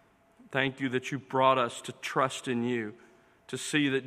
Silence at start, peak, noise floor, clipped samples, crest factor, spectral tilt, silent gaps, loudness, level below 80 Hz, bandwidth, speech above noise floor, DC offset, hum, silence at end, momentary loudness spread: 0.5 s; -10 dBFS; -60 dBFS; under 0.1%; 22 dB; -4.5 dB/octave; none; -30 LUFS; -74 dBFS; 15 kHz; 30 dB; under 0.1%; none; 0 s; 12 LU